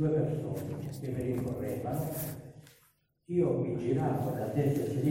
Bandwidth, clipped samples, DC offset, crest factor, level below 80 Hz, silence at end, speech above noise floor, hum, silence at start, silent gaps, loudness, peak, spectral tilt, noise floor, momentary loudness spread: 16.5 kHz; under 0.1%; under 0.1%; 16 dB; -58 dBFS; 0 s; 37 dB; none; 0 s; none; -33 LUFS; -16 dBFS; -8 dB/octave; -69 dBFS; 9 LU